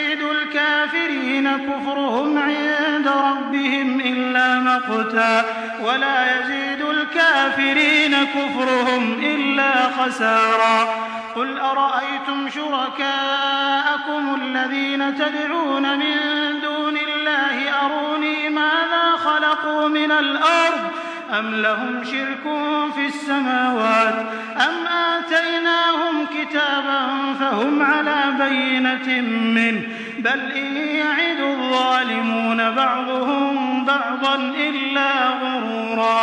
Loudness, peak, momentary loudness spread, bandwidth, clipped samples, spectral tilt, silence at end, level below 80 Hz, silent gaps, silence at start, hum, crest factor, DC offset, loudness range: -19 LUFS; -2 dBFS; 6 LU; 10.5 kHz; under 0.1%; -3.5 dB/octave; 0 s; -74 dBFS; none; 0 s; none; 16 dB; under 0.1%; 3 LU